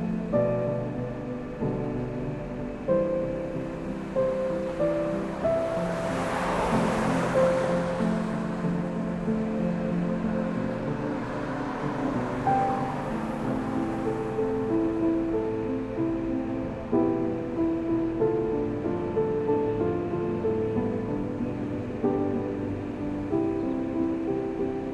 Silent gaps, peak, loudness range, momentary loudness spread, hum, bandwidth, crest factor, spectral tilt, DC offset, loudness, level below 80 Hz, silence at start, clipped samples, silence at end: none; -12 dBFS; 3 LU; 6 LU; none; 12 kHz; 16 dB; -8 dB/octave; under 0.1%; -28 LUFS; -46 dBFS; 0 s; under 0.1%; 0 s